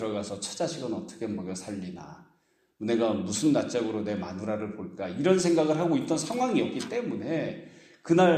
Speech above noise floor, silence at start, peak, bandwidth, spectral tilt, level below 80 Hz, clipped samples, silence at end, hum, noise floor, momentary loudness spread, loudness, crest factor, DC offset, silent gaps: 41 dB; 0 s; -10 dBFS; 13.5 kHz; -5.5 dB/octave; -68 dBFS; under 0.1%; 0 s; none; -69 dBFS; 13 LU; -29 LUFS; 18 dB; under 0.1%; none